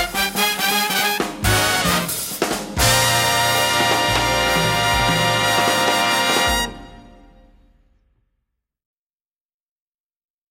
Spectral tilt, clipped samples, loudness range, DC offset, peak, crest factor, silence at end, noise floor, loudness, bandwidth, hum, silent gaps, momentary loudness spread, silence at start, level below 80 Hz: -2.5 dB/octave; under 0.1%; 6 LU; under 0.1%; -4 dBFS; 16 dB; 3.5 s; under -90 dBFS; -17 LUFS; 16.5 kHz; none; none; 6 LU; 0 s; -36 dBFS